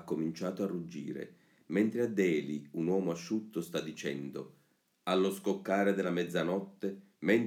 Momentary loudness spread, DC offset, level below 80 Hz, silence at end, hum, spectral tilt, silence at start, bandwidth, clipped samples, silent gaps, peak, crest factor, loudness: 11 LU; under 0.1%; -80 dBFS; 0 s; none; -6 dB/octave; 0 s; 17 kHz; under 0.1%; none; -16 dBFS; 18 dB; -34 LUFS